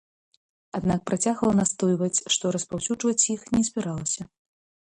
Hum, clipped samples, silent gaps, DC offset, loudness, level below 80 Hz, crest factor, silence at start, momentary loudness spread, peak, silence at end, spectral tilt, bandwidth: none; under 0.1%; none; under 0.1%; -25 LUFS; -56 dBFS; 18 dB; 0.75 s; 7 LU; -8 dBFS; 0.7 s; -4 dB/octave; 11 kHz